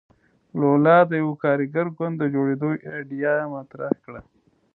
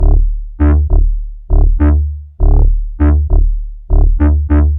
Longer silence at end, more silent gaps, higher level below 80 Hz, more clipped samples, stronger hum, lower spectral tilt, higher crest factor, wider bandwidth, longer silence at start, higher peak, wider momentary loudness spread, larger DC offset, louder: first, 0.55 s vs 0 s; neither; second, -64 dBFS vs -10 dBFS; neither; neither; second, -11.5 dB/octave vs -13 dB/octave; first, 20 dB vs 8 dB; first, 4.2 kHz vs 2.5 kHz; first, 0.55 s vs 0 s; about the same, -2 dBFS vs 0 dBFS; first, 16 LU vs 8 LU; neither; second, -22 LUFS vs -14 LUFS